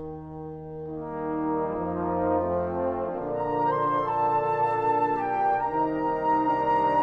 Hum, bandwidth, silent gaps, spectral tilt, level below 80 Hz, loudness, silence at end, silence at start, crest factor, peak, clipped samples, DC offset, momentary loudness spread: none; 6.4 kHz; none; -9 dB/octave; -54 dBFS; -26 LUFS; 0 s; 0 s; 14 dB; -14 dBFS; under 0.1%; under 0.1%; 12 LU